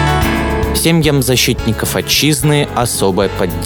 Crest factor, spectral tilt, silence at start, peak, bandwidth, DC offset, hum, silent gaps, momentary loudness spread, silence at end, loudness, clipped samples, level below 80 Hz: 12 dB; -4 dB/octave; 0 s; 0 dBFS; over 20 kHz; under 0.1%; none; none; 4 LU; 0 s; -13 LUFS; under 0.1%; -26 dBFS